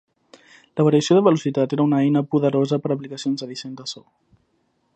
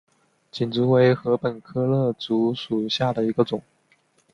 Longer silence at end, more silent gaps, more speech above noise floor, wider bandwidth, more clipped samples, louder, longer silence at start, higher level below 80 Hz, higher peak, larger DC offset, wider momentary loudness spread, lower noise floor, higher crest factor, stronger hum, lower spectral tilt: first, 0.95 s vs 0.75 s; neither; first, 48 dB vs 41 dB; first, 8.6 kHz vs 7.4 kHz; neither; first, -20 LUFS vs -23 LUFS; first, 0.75 s vs 0.55 s; second, -70 dBFS vs -60 dBFS; about the same, -2 dBFS vs -4 dBFS; neither; first, 16 LU vs 9 LU; first, -67 dBFS vs -63 dBFS; about the same, 18 dB vs 18 dB; neither; about the same, -6.5 dB/octave vs -7.5 dB/octave